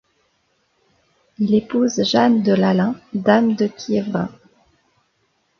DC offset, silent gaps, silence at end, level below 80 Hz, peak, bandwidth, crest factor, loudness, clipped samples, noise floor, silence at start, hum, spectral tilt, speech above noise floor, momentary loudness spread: under 0.1%; none; 1.3 s; -60 dBFS; -2 dBFS; 7 kHz; 18 dB; -18 LUFS; under 0.1%; -66 dBFS; 1.4 s; none; -6 dB/octave; 49 dB; 9 LU